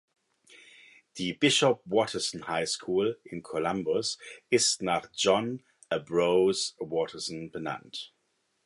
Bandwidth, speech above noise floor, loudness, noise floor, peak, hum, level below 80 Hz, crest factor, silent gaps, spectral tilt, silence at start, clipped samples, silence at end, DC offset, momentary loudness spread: 11.5 kHz; 47 dB; -28 LUFS; -75 dBFS; -10 dBFS; none; -68 dBFS; 20 dB; none; -3 dB/octave; 1.15 s; under 0.1%; 0.6 s; under 0.1%; 13 LU